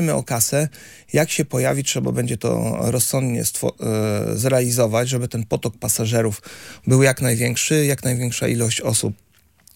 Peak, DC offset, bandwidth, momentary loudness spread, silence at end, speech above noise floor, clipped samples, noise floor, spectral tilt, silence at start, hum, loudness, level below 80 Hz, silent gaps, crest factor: -2 dBFS; under 0.1%; 17 kHz; 6 LU; 0.6 s; 34 dB; under 0.1%; -54 dBFS; -4.5 dB/octave; 0 s; none; -20 LUFS; -52 dBFS; none; 18 dB